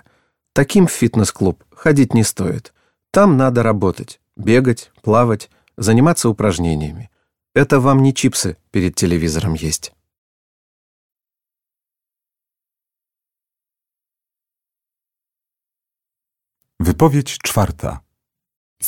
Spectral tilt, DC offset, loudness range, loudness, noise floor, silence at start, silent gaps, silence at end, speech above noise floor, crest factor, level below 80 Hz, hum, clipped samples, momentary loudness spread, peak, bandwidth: -5.5 dB/octave; under 0.1%; 7 LU; -16 LUFS; -89 dBFS; 0.55 s; 10.18-11.10 s, 18.56-18.76 s; 0 s; 74 dB; 18 dB; -40 dBFS; none; under 0.1%; 11 LU; 0 dBFS; 17.5 kHz